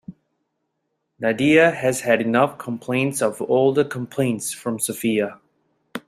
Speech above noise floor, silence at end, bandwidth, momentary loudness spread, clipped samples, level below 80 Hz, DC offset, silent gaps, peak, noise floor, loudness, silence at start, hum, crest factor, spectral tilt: 55 dB; 0.1 s; 15.5 kHz; 10 LU; under 0.1%; -62 dBFS; under 0.1%; none; -2 dBFS; -75 dBFS; -20 LUFS; 0.1 s; none; 20 dB; -5 dB/octave